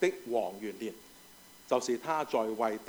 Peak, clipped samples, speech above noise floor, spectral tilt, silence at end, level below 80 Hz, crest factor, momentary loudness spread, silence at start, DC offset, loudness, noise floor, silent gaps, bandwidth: -14 dBFS; under 0.1%; 23 dB; -4 dB/octave; 0 s; -74 dBFS; 20 dB; 22 LU; 0 s; under 0.1%; -33 LUFS; -56 dBFS; none; over 20 kHz